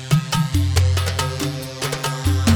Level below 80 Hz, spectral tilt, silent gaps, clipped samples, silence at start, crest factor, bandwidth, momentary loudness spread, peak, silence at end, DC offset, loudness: -32 dBFS; -5 dB/octave; none; under 0.1%; 0 s; 16 dB; 19 kHz; 7 LU; -4 dBFS; 0 s; under 0.1%; -21 LUFS